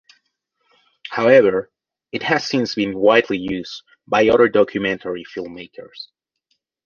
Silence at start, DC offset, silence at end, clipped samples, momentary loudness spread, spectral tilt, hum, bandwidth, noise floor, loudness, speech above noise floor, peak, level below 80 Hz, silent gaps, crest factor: 1.05 s; under 0.1%; 0.8 s; under 0.1%; 22 LU; -5.5 dB/octave; none; 7 kHz; -71 dBFS; -17 LUFS; 53 dB; -2 dBFS; -56 dBFS; none; 18 dB